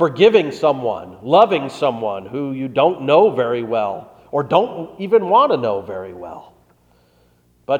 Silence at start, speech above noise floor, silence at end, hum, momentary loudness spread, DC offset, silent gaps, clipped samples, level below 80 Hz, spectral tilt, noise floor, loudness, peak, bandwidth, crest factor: 0 s; 39 dB; 0 s; 60 Hz at -50 dBFS; 16 LU; under 0.1%; none; under 0.1%; -62 dBFS; -6.5 dB/octave; -56 dBFS; -17 LUFS; 0 dBFS; 9.2 kHz; 18 dB